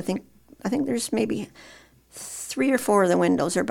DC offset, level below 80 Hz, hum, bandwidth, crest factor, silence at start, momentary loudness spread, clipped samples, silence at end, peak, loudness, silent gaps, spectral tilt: under 0.1%; -60 dBFS; none; 18 kHz; 16 dB; 0 s; 14 LU; under 0.1%; 0 s; -8 dBFS; -24 LUFS; none; -5 dB/octave